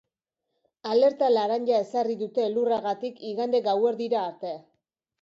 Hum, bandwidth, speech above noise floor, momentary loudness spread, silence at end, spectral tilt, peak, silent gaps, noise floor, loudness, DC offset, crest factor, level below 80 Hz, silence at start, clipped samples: none; 7.6 kHz; 58 dB; 11 LU; 0.6 s; -6 dB/octave; -12 dBFS; none; -83 dBFS; -25 LUFS; under 0.1%; 16 dB; -78 dBFS; 0.85 s; under 0.1%